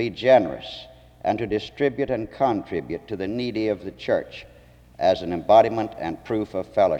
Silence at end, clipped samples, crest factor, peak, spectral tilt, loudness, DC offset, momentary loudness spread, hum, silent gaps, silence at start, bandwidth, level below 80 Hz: 0 s; under 0.1%; 18 dB; -4 dBFS; -7 dB/octave; -23 LUFS; under 0.1%; 14 LU; none; none; 0 s; 8 kHz; -52 dBFS